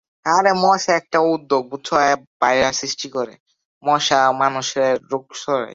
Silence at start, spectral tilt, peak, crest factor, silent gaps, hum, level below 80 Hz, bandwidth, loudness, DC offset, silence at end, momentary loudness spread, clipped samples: 0.25 s; -3 dB/octave; -2 dBFS; 18 dB; 2.27-2.40 s, 3.40-3.46 s, 3.65-3.81 s; none; -58 dBFS; 8 kHz; -18 LUFS; under 0.1%; 0 s; 10 LU; under 0.1%